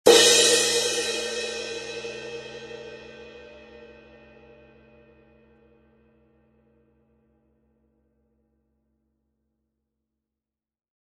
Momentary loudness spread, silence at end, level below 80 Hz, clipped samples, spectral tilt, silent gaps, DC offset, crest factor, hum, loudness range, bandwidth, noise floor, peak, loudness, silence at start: 29 LU; 7.7 s; -64 dBFS; under 0.1%; -0.5 dB/octave; none; under 0.1%; 28 dB; none; 28 LU; 13.5 kHz; -89 dBFS; 0 dBFS; -20 LUFS; 0.05 s